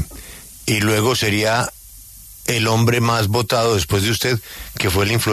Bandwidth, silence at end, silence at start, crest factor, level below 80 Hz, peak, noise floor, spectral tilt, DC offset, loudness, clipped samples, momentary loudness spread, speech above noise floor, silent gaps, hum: 14 kHz; 0 s; 0 s; 14 dB; -42 dBFS; -4 dBFS; -40 dBFS; -4.5 dB/octave; under 0.1%; -18 LUFS; under 0.1%; 19 LU; 23 dB; none; none